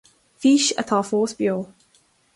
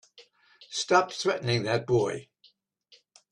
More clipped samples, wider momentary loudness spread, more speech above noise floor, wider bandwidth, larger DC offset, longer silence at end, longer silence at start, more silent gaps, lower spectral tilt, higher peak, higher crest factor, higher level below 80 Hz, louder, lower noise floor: neither; about the same, 10 LU vs 10 LU; about the same, 41 dB vs 38 dB; about the same, 11.5 kHz vs 11 kHz; neither; second, 0.7 s vs 1.1 s; first, 0.4 s vs 0.2 s; neither; about the same, -3.5 dB/octave vs -4.5 dB/octave; about the same, -6 dBFS vs -8 dBFS; second, 16 dB vs 22 dB; about the same, -66 dBFS vs -64 dBFS; first, -21 LUFS vs -27 LUFS; about the same, -61 dBFS vs -64 dBFS